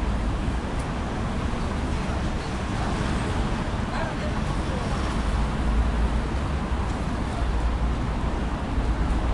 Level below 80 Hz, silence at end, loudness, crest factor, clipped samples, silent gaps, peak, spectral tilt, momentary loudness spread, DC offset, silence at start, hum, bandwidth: -28 dBFS; 0 s; -27 LUFS; 14 dB; under 0.1%; none; -12 dBFS; -6.5 dB/octave; 3 LU; under 0.1%; 0 s; none; 11.5 kHz